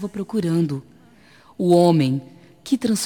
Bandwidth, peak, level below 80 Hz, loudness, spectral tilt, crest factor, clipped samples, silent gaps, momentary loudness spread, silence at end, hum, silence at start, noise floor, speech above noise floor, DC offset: 18 kHz; -4 dBFS; -62 dBFS; -20 LUFS; -6.5 dB/octave; 16 dB; under 0.1%; none; 13 LU; 0 s; none; 0 s; -51 dBFS; 32 dB; 0.1%